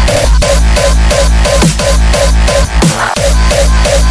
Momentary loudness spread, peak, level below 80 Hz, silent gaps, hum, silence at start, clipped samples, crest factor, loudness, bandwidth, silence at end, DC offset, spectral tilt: 1 LU; 0 dBFS; -10 dBFS; none; none; 0 s; under 0.1%; 8 dB; -9 LUFS; 11 kHz; 0 s; under 0.1%; -4 dB/octave